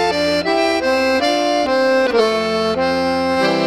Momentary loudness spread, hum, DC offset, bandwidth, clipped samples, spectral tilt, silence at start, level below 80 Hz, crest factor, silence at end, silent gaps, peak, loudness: 3 LU; none; 0.2%; 14 kHz; under 0.1%; -4 dB/octave; 0 s; -48 dBFS; 12 dB; 0 s; none; -4 dBFS; -16 LUFS